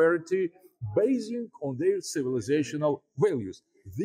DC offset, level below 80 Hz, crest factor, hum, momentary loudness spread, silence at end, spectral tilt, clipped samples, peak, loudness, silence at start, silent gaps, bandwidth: under 0.1%; -68 dBFS; 14 dB; none; 12 LU; 0 s; -6 dB/octave; under 0.1%; -14 dBFS; -29 LUFS; 0 s; none; 15.5 kHz